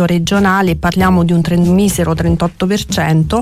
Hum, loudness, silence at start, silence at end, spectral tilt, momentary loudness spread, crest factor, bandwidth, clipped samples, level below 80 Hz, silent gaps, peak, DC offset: none; -13 LUFS; 0 s; 0 s; -6 dB/octave; 4 LU; 8 dB; 15.5 kHz; under 0.1%; -30 dBFS; none; -2 dBFS; under 0.1%